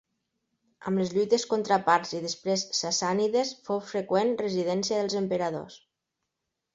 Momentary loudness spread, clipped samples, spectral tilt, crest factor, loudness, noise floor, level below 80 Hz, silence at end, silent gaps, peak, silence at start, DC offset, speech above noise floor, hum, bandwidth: 7 LU; under 0.1%; -4 dB/octave; 22 dB; -27 LUFS; -84 dBFS; -70 dBFS; 0.95 s; none; -8 dBFS; 0.8 s; under 0.1%; 57 dB; none; 8 kHz